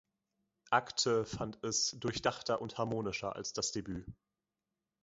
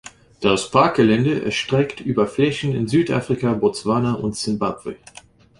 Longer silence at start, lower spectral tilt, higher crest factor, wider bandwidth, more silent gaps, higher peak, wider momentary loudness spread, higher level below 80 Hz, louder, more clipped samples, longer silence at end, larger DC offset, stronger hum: first, 0.65 s vs 0.05 s; second, -3 dB/octave vs -6 dB/octave; first, 24 dB vs 18 dB; second, 7.6 kHz vs 11.5 kHz; neither; second, -14 dBFS vs -2 dBFS; about the same, 9 LU vs 7 LU; second, -64 dBFS vs -50 dBFS; second, -35 LUFS vs -20 LUFS; neither; first, 0.9 s vs 0.65 s; neither; neither